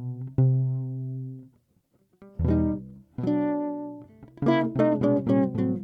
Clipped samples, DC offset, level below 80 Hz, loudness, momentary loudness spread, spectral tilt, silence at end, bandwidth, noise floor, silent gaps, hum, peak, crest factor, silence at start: under 0.1%; under 0.1%; -48 dBFS; -26 LUFS; 17 LU; -10.5 dB/octave; 0 s; 5 kHz; -67 dBFS; none; none; -10 dBFS; 16 dB; 0 s